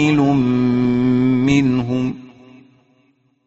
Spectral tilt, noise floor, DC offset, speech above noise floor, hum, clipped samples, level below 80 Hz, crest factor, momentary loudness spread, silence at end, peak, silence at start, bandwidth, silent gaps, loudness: -7 dB/octave; -60 dBFS; under 0.1%; 44 dB; none; under 0.1%; -48 dBFS; 14 dB; 7 LU; 1.2 s; -4 dBFS; 0 s; 8 kHz; none; -16 LUFS